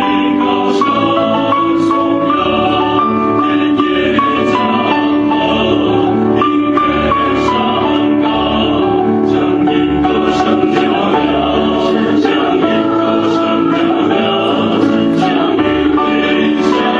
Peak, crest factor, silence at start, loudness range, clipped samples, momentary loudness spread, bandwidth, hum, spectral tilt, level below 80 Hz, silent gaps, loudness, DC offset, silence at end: 0 dBFS; 12 dB; 0 s; 0 LU; under 0.1%; 1 LU; 7.8 kHz; none; -6.5 dB/octave; -38 dBFS; none; -12 LUFS; under 0.1%; 0 s